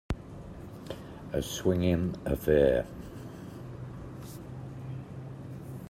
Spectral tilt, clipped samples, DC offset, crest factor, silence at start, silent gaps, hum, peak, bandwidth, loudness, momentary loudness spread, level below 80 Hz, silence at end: -6.5 dB/octave; under 0.1%; under 0.1%; 22 dB; 0.1 s; none; none; -12 dBFS; 16 kHz; -31 LUFS; 18 LU; -48 dBFS; 0 s